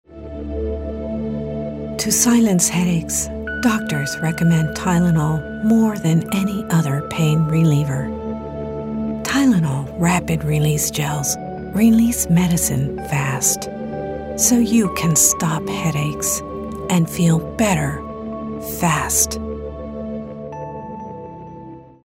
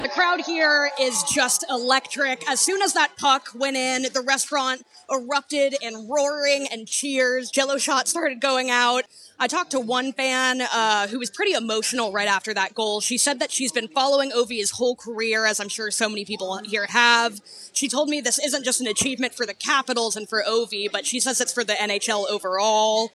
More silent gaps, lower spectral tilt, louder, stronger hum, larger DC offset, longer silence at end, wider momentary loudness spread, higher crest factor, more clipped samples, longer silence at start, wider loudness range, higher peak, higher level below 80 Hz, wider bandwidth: neither; first, -5 dB/octave vs -0.5 dB/octave; first, -19 LUFS vs -22 LUFS; neither; neither; about the same, 0.2 s vs 0.1 s; first, 14 LU vs 6 LU; about the same, 18 dB vs 18 dB; neither; about the same, 0.1 s vs 0 s; about the same, 3 LU vs 2 LU; about the same, -2 dBFS vs -4 dBFS; first, -40 dBFS vs -70 dBFS; about the same, 16 kHz vs 15.5 kHz